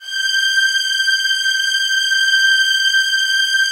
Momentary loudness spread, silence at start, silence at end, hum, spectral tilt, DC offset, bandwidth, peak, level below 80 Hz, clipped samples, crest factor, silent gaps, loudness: 3 LU; 0 s; 0 s; none; 7.5 dB/octave; under 0.1%; 16 kHz; -4 dBFS; -66 dBFS; under 0.1%; 12 dB; none; -13 LUFS